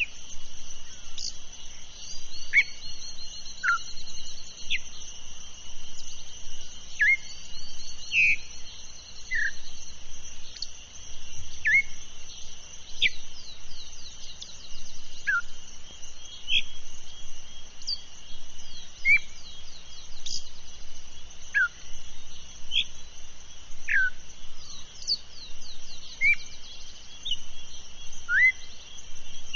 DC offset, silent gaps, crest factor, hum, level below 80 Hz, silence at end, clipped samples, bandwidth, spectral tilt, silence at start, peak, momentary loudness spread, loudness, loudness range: under 0.1%; none; 18 dB; none; -42 dBFS; 0 s; under 0.1%; 7.2 kHz; 2 dB/octave; 0 s; -10 dBFS; 23 LU; -27 LUFS; 7 LU